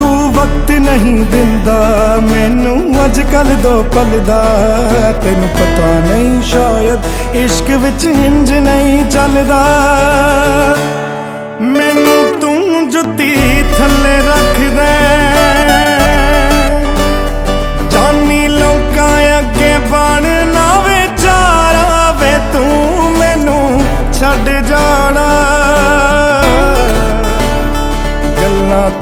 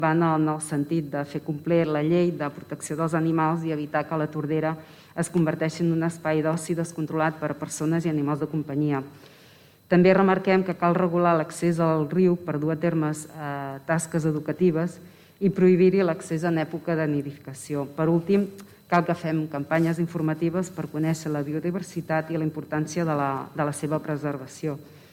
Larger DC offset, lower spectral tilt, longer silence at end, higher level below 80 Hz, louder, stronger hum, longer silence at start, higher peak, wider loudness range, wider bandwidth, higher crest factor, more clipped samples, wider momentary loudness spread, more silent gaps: neither; second, -5 dB/octave vs -7 dB/octave; second, 0 s vs 0.15 s; first, -16 dBFS vs -66 dBFS; first, -9 LUFS vs -25 LUFS; neither; about the same, 0 s vs 0 s; first, 0 dBFS vs -6 dBFS; second, 2 LU vs 5 LU; first, 18.5 kHz vs 15 kHz; second, 8 dB vs 18 dB; first, 0.5% vs under 0.1%; second, 5 LU vs 10 LU; neither